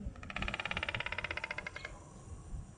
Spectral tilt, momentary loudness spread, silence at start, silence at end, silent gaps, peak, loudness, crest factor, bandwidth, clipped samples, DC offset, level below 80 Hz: -4 dB/octave; 14 LU; 0 s; 0 s; none; -18 dBFS; -40 LUFS; 24 dB; 10 kHz; under 0.1%; under 0.1%; -50 dBFS